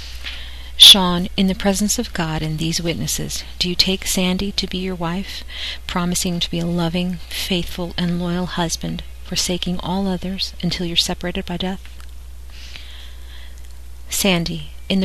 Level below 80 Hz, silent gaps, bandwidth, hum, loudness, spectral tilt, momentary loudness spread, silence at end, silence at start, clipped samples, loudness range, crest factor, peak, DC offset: -34 dBFS; none; 14 kHz; none; -18 LUFS; -3.5 dB/octave; 16 LU; 0 s; 0 s; under 0.1%; 11 LU; 20 dB; 0 dBFS; 2%